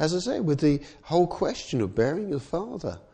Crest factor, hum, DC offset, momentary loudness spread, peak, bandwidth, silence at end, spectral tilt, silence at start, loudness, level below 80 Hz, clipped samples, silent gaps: 16 dB; none; under 0.1%; 8 LU; -10 dBFS; 9.6 kHz; 0.15 s; -6.5 dB/octave; 0 s; -27 LUFS; -50 dBFS; under 0.1%; none